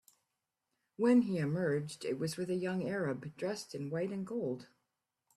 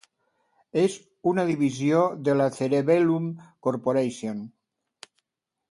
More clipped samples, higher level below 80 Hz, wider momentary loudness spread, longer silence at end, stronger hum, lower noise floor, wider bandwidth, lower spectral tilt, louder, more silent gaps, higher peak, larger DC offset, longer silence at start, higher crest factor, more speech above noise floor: neither; second, -76 dBFS vs -70 dBFS; about the same, 11 LU vs 12 LU; second, 0.7 s vs 1.25 s; neither; about the same, -87 dBFS vs -84 dBFS; first, 13 kHz vs 11.5 kHz; about the same, -6.5 dB/octave vs -7 dB/octave; second, -35 LUFS vs -25 LUFS; neither; second, -18 dBFS vs -8 dBFS; neither; first, 1 s vs 0.75 s; about the same, 18 dB vs 18 dB; second, 52 dB vs 60 dB